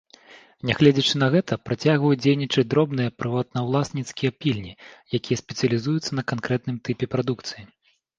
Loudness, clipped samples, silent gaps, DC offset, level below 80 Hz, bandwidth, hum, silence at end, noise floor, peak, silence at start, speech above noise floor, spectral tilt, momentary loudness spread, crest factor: -23 LUFS; under 0.1%; none; under 0.1%; -56 dBFS; 9.2 kHz; none; 0.55 s; -50 dBFS; -2 dBFS; 0.35 s; 27 dB; -6 dB/octave; 10 LU; 20 dB